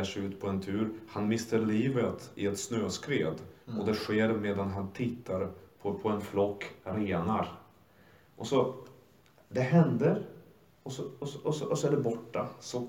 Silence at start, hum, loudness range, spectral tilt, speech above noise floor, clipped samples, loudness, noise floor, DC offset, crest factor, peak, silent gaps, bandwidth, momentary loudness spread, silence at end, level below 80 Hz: 0 s; none; 3 LU; -6.5 dB/octave; 30 dB; under 0.1%; -32 LUFS; -62 dBFS; under 0.1%; 20 dB; -12 dBFS; none; 16.5 kHz; 11 LU; 0 s; -70 dBFS